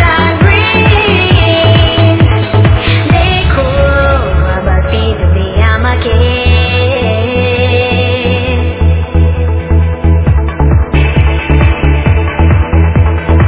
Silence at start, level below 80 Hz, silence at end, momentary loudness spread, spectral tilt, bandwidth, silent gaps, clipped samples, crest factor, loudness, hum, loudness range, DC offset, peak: 0 s; -12 dBFS; 0 s; 4 LU; -10.5 dB/octave; 4 kHz; none; 0.6%; 8 dB; -9 LUFS; none; 3 LU; under 0.1%; 0 dBFS